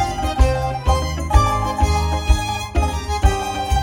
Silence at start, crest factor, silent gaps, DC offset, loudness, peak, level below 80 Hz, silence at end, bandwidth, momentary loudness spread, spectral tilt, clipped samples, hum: 0 s; 18 dB; none; under 0.1%; -19 LUFS; 0 dBFS; -20 dBFS; 0 s; 16.5 kHz; 4 LU; -5 dB/octave; under 0.1%; none